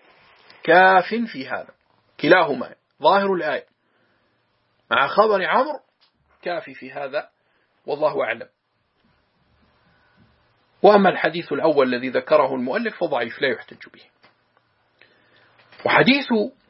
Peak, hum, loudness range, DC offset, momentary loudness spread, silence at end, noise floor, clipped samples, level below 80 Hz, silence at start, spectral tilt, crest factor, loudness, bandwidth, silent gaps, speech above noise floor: 0 dBFS; none; 10 LU; under 0.1%; 16 LU; 0.2 s; -68 dBFS; under 0.1%; -72 dBFS; 0.65 s; -9.5 dB/octave; 22 dB; -20 LUFS; 5.8 kHz; none; 49 dB